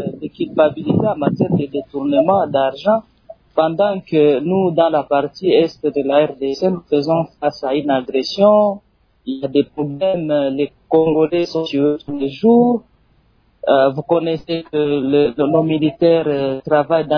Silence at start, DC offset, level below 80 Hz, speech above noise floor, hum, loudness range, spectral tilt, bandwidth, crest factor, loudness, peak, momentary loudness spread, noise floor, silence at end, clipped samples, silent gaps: 0 s; under 0.1%; -54 dBFS; 40 dB; none; 2 LU; -8 dB/octave; 5.4 kHz; 14 dB; -17 LUFS; -2 dBFS; 8 LU; -56 dBFS; 0 s; under 0.1%; none